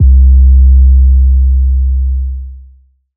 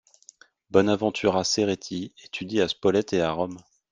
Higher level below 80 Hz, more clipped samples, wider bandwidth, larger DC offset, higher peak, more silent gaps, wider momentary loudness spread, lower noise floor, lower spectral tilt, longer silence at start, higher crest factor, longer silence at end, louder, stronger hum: first, -6 dBFS vs -60 dBFS; neither; second, 0.3 kHz vs 10 kHz; neither; first, 0 dBFS vs -4 dBFS; neither; about the same, 13 LU vs 12 LU; second, -43 dBFS vs -55 dBFS; first, -23.5 dB/octave vs -4.5 dB/octave; second, 0 s vs 0.7 s; second, 6 dB vs 22 dB; first, 0.55 s vs 0.3 s; first, -9 LUFS vs -25 LUFS; neither